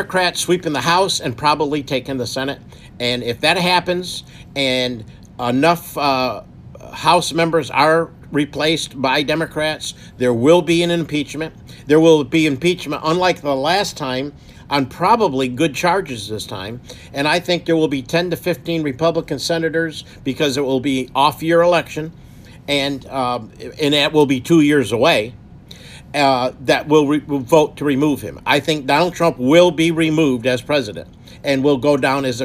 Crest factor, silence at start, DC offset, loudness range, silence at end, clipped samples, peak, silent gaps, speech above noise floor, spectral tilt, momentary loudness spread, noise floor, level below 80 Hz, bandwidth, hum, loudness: 16 dB; 0 s; under 0.1%; 4 LU; 0 s; under 0.1%; 0 dBFS; none; 22 dB; -4.5 dB/octave; 13 LU; -39 dBFS; -48 dBFS; 15.5 kHz; none; -17 LUFS